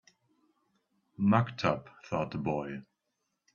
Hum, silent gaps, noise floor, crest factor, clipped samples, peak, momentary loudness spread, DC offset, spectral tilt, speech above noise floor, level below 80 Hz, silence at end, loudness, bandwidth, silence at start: none; none; -82 dBFS; 24 dB; under 0.1%; -10 dBFS; 12 LU; under 0.1%; -7.5 dB/octave; 52 dB; -66 dBFS; 0.7 s; -32 LUFS; 7 kHz; 1.2 s